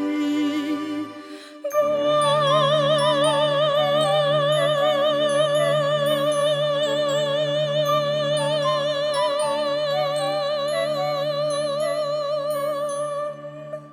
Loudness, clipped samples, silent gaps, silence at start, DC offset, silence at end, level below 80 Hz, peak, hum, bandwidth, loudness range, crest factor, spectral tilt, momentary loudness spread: -21 LUFS; under 0.1%; none; 0 s; under 0.1%; 0 s; -66 dBFS; -8 dBFS; none; 16 kHz; 5 LU; 12 dB; -4.5 dB/octave; 8 LU